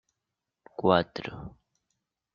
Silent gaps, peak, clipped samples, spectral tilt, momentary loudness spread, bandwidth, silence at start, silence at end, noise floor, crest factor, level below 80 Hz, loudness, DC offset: none; -6 dBFS; under 0.1%; -4.5 dB/octave; 21 LU; 7 kHz; 0.8 s; 0.85 s; -86 dBFS; 26 dB; -60 dBFS; -27 LUFS; under 0.1%